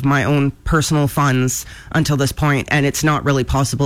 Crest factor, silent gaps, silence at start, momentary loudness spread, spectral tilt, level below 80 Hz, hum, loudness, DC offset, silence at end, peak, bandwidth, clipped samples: 12 dB; none; 0 s; 4 LU; -5 dB/octave; -32 dBFS; none; -17 LUFS; under 0.1%; 0 s; -4 dBFS; 16 kHz; under 0.1%